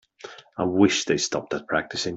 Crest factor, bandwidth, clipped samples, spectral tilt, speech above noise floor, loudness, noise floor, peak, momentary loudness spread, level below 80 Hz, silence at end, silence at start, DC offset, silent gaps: 20 dB; 8 kHz; under 0.1%; -3.5 dB/octave; 21 dB; -23 LUFS; -45 dBFS; -4 dBFS; 20 LU; -62 dBFS; 0 s; 0.25 s; under 0.1%; none